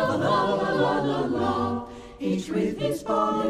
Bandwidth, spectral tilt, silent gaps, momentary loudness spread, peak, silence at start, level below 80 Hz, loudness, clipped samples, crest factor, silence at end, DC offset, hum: 15 kHz; -6 dB/octave; none; 6 LU; -10 dBFS; 0 s; -52 dBFS; -25 LUFS; under 0.1%; 14 dB; 0 s; under 0.1%; none